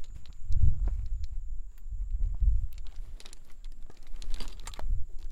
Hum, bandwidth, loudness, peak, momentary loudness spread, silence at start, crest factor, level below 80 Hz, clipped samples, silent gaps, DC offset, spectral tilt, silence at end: none; 8.4 kHz; -36 LUFS; -10 dBFS; 21 LU; 0 s; 16 dB; -32 dBFS; under 0.1%; none; under 0.1%; -5.5 dB/octave; 0 s